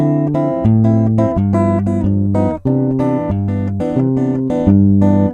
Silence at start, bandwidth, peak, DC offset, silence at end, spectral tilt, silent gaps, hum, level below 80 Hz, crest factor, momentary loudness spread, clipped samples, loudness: 0 s; 8.2 kHz; 0 dBFS; under 0.1%; 0 s; -11 dB/octave; none; none; -36 dBFS; 14 dB; 6 LU; under 0.1%; -14 LUFS